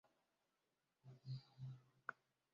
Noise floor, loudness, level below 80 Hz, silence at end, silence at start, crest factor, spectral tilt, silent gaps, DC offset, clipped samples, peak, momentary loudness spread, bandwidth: -89 dBFS; -56 LUFS; -88 dBFS; 0.4 s; 0.05 s; 26 dB; -5 dB/octave; none; under 0.1%; under 0.1%; -32 dBFS; 7 LU; 7.2 kHz